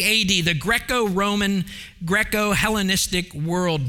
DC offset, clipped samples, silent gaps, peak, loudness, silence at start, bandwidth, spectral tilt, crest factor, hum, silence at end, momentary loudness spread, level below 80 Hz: under 0.1%; under 0.1%; none; -2 dBFS; -20 LUFS; 0 s; 18 kHz; -3.5 dB/octave; 18 dB; none; 0 s; 7 LU; -40 dBFS